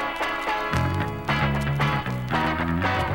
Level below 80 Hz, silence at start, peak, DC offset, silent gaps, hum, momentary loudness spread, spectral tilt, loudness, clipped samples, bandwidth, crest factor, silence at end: -38 dBFS; 0 s; -6 dBFS; under 0.1%; none; none; 3 LU; -6 dB/octave; -25 LUFS; under 0.1%; 16.5 kHz; 18 dB; 0 s